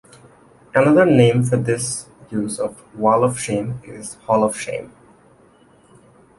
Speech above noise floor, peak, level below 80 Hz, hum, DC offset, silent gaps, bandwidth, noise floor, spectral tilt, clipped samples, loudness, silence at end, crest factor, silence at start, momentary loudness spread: 34 dB; 0 dBFS; -54 dBFS; none; under 0.1%; none; 11.5 kHz; -52 dBFS; -6 dB/octave; under 0.1%; -18 LUFS; 1.5 s; 20 dB; 0.75 s; 16 LU